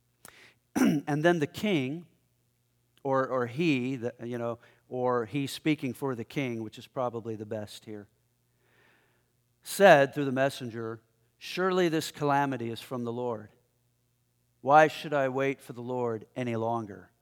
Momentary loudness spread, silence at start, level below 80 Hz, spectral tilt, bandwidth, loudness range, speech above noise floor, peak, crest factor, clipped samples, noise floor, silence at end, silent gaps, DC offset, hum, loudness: 17 LU; 0.75 s; -76 dBFS; -5.5 dB/octave; 18.5 kHz; 8 LU; 44 dB; -4 dBFS; 26 dB; under 0.1%; -73 dBFS; 0.2 s; none; under 0.1%; 60 Hz at -60 dBFS; -29 LUFS